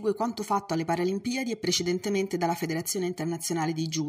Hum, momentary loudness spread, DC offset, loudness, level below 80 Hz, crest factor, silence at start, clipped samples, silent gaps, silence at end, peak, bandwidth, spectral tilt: none; 4 LU; under 0.1%; -29 LUFS; -68 dBFS; 18 dB; 0 s; under 0.1%; none; 0 s; -12 dBFS; 15.5 kHz; -4.5 dB/octave